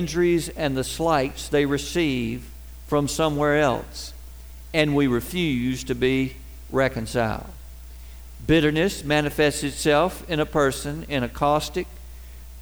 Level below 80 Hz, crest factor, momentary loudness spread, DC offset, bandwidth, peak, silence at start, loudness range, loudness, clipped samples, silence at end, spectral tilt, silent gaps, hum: -40 dBFS; 18 dB; 22 LU; 0.3%; over 20 kHz; -6 dBFS; 0 s; 3 LU; -23 LUFS; under 0.1%; 0 s; -5 dB/octave; none; none